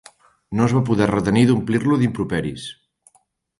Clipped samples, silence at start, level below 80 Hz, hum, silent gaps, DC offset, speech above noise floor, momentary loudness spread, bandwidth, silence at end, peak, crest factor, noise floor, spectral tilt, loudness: under 0.1%; 0.5 s; -48 dBFS; none; none; under 0.1%; 44 dB; 12 LU; 11.5 kHz; 0.9 s; -4 dBFS; 16 dB; -62 dBFS; -7 dB/octave; -19 LUFS